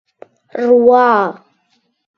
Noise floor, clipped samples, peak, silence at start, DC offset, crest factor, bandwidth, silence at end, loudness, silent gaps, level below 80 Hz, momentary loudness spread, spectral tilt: -62 dBFS; under 0.1%; 0 dBFS; 0.55 s; under 0.1%; 14 dB; 5.8 kHz; 0.85 s; -12 LUFS; none; -64 dBFS; 13 LU; -7 dB/octave